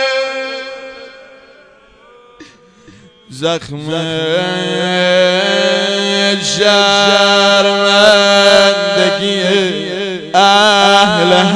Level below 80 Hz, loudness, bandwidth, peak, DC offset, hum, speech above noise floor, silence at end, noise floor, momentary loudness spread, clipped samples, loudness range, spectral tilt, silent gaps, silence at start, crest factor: -54 dBFS; -10 LUFS; 11 kHz; 0 dBFS; under 0.1%; none; 32 dB; 0 s; -44 dBFS; 13 LU; 0.3%; 16 LU; -3 dB/octave; none; 0 s; 12 dB